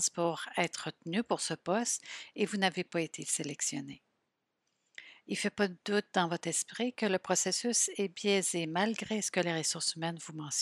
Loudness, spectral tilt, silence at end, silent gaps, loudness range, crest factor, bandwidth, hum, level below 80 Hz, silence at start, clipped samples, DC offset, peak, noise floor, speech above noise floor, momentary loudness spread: -33 LUFS; -3 dB/octave; 0 s; none; 5 LU; 22 dB; 15 kHz; none; -80 dBFS; 0 s; under 0.1%; under 0.1%; -12 dBFS; -83 dBFS; 49 dB; 9 LU